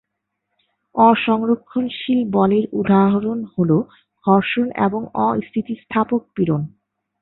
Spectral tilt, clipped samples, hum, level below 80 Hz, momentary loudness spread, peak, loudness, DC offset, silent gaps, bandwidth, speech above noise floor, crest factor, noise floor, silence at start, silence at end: -12 dB/octave; under 0.1%; none; -58 dBFS; 9 LU; -2 dBFS; -19 LUFS; under 0.1%; none; 4.1 kHz; 59 dB; 16 dB; -77 dBFS; 0.95 s; 0.55 s